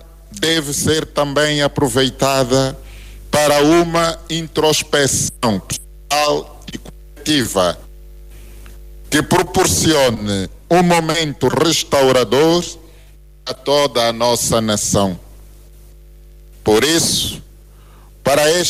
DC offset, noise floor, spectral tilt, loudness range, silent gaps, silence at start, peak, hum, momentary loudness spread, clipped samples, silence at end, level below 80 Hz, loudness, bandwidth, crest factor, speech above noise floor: under 0.1%; -42 dBFS; -3.5 dB/octave; 5 LU; none; 0 s; -4 dBFS; 50 Hz at -40 dBFS; 13 LU; under 0.1%; 0 s; -38 dBFS; -15 LUFS; 16 kHz; 14 dB; 27 dB